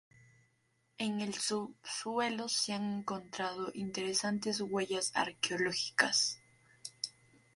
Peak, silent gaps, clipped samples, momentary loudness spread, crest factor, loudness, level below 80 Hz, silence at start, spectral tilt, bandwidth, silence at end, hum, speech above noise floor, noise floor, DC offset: -12 dBFS; none; under 0.1%; 11 LU; 26 dB; -35 LUFS; -78 dBFS; 1 s; -2.5 dB/octave; 11.5 kHz; 0.45 s; none; 40 dB; -76 dBFS; under 0.1%